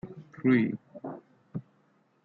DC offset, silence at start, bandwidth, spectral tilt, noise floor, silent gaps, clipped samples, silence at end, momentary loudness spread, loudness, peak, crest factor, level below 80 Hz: under 0.1%; 0.05 s; 4.5 kHz; -7.5 dB/octave; -67 dBFS; none; under 0.1%; 0.65 s; 19 LU; -28 LUFS; -14 dBFS; 18 dB; -72 dBFS